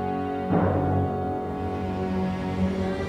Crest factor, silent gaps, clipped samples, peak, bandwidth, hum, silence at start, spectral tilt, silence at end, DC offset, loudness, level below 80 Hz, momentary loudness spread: 14 dB; none; under 0.1%; -12 dBFS; 9.6 kHz; none; 0 s; -8.5 dB/octave; 0 s; under 0.1%; -27 LUFS; -44 dBFS; 6 LU